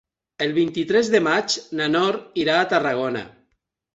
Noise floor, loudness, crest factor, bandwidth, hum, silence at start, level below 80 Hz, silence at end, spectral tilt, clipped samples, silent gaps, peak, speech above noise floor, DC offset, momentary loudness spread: -71 dBFS; -21 LUFS; 18 dB; 8.2 kHz; none; 0.4 s; -64 dBFS; 0.7 s; -4 dB/octave; under 0.1%; none; -4 dBFS; 51 dB; under 0.1%; 8 LU